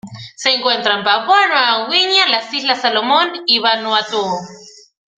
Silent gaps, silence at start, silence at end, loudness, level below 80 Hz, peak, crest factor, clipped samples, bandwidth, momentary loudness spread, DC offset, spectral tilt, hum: none; 0.05 s; 0.5 s; -14 LUFS; -64 dBFS; 0 dBFS; 16 dB; under 0.1%; 9.4 kHz; 8 LU; under 0.1%; -2 dB/octave; none